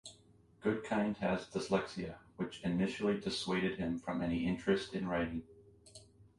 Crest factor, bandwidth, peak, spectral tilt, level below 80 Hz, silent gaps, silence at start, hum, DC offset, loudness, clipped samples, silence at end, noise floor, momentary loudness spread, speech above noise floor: 20 dB; 11.5 kHz; -16 dBFS; -6 dB/octave; -60 dBFS; none; 0.05 s; none; under 0.1%; -37 LUFS; under 0.1%; 0.15 s; -65 dBFS; 11 LU; 29 dB